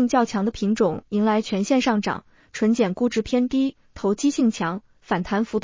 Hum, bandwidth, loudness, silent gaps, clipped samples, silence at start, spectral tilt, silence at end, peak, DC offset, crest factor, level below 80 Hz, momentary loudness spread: none; 7.6 kHz; -23 LUFS; none; under 0.1%; 0 s; -5.5 dB/octave; 0 s; -8 dBFS; under 0.1%; 14 dB; -52 dBFS; 7 LU